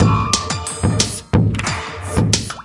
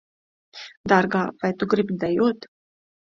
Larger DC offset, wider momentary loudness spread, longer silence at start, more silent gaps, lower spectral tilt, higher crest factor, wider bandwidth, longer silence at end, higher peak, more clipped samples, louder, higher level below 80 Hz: neither; second, 6 LU vs 17 LU; second, 0 s vs 0.55 s; second, none vs 0.77-0.84 s; second, -4.5 dB/octave vs -7 dB/octave; about the same, 18 dB vs 22 dB; first, 11.5 kHz vs 7.4 kHz; second, 0 s vs 0.6 s; about the same, 0 dBFS vs -2 dBFS; neither; first, -18 LUFS vs -22 LUFS; first, -34 dBFS vs -58 dBFS